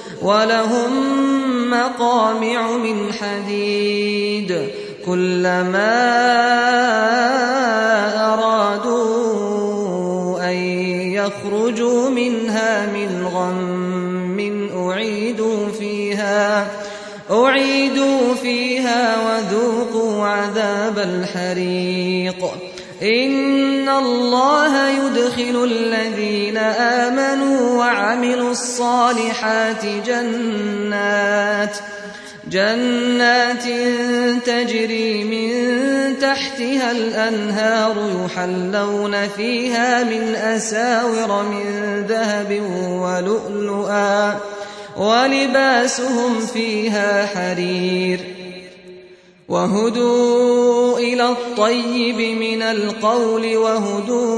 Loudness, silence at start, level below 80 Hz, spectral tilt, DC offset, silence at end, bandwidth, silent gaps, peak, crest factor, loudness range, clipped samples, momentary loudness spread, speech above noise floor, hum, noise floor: -18 LUFS; 0 s; -62 dBFS; -4.5 dB/octave; under 0.1%; 0 s; 11 kHz; none; -2 dBFS; 16 dB; 4 LU; under 0.1%; 7 LU; 27 dB; none; -44 dBFS